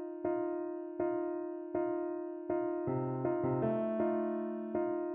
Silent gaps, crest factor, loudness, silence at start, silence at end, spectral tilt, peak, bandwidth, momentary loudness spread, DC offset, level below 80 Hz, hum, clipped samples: none; 14 dB; -36 LUFS; 0 s; 0 s; -9.5 dB/octave; -20 dBFS; 3.3 kHz; 6 LU; under 0.1%; -70 dBFS; none; under 0.1%